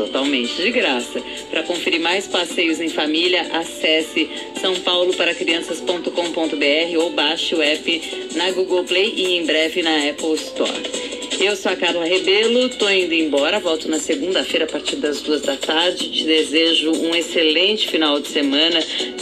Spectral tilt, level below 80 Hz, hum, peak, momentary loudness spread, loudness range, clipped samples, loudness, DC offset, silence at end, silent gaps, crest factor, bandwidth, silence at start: -1.5 dB/octave; -60 dBFS; none; -2 dBFS; 7 LU; 2 LU; under 0.1%; -18 LUFS; under 0.1%; 0 s; none; 16 dB; 14.5 kHz; 0 s